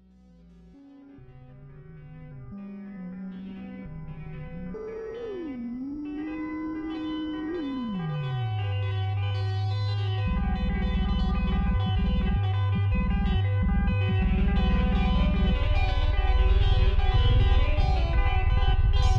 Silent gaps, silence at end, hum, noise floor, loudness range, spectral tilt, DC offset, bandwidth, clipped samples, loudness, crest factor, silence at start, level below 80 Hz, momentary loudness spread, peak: none; 0 s; none; -54 dBFS; 16 LU; -8 dB/octave; under 0.1%; 6.8 kHz; under 0.1%; -27 LUFS; 14 dB; 0.95 s; -28 dBFS; 15 LU; -10 dBFS